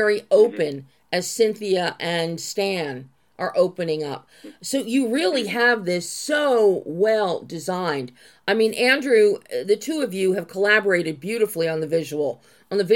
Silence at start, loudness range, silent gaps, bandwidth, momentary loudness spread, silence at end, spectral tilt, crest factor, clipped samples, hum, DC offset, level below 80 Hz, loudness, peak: 0 s; 4 LU; none; 17.5 kHz; 11 LU; 0 s; -4 dB/octave; 16 dB; under 0.1%; none; under 0.1%; -76 dBFS; -22 LUFS; -4 dBFS